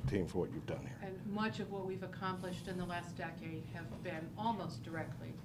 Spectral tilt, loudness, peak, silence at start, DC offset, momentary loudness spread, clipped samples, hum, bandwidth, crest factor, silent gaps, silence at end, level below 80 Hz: -6.5 dB/octave; -42 LUFS; -24 dBFS; 0 s; under 0.1%; 7 LU; under 0.1%; none; 15.5 kHz; 18 dB; none; 0 s; -60 dBFS